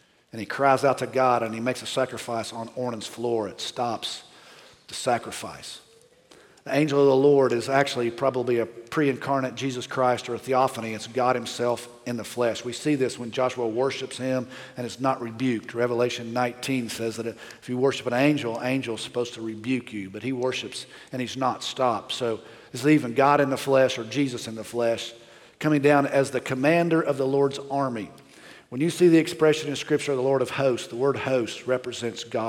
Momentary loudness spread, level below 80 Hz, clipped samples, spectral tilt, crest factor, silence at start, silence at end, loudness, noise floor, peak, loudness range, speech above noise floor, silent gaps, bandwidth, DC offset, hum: 13 LU; -70 dBFS; under 0.1%; -5 dB/octave; 18 dB; 0.35 s; 0 s; -25 LUFS; -55 dBFS; -6 dBFS; 6 LU; 31 dB; none; 16.5 kHz; under 0.1%; none